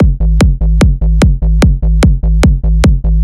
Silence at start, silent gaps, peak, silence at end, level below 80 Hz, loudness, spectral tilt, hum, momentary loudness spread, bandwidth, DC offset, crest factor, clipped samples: 0 s; none; 0 dBFS; 0 s; -10 dBFS; -11 LUFS; -7 dB/octave; none; 0 LU; 11.5 kHz; 0.4%; 8 dB; under 0.1%